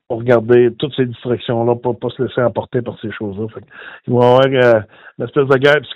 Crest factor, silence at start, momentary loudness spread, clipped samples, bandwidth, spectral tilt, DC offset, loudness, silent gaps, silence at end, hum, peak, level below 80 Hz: 16 dB; 0.1 s; 16 LU; 0.3%; 7.2 kHz; -8 dB/octave; under 0.1%; -15 LUFS; none; 0 s; none; 0 dBFS; -56 dBFS